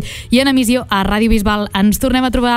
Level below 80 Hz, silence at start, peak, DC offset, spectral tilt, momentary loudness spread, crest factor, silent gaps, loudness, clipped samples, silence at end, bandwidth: -26 dBFS; 0 s; -2 dBFS; under 0.1%; -4.5 dB/octave; 3 LU; 12 dB; none; -14 LUFS; under 0.1%; 0 s; 16 kHz